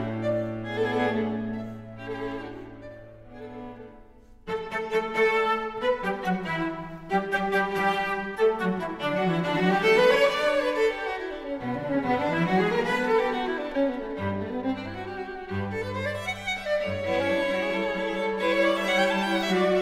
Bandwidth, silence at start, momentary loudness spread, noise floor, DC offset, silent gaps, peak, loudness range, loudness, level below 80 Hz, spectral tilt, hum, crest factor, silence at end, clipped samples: 15.5 kHz; 0 s; 13 LU; -50 dBFS; under 0.1%; none; -8 dBFS; 8 LU; -26 LUFS; -52 dBFS; -5.5 dB/octave; none; 18 dB; 0 s; under 0.1%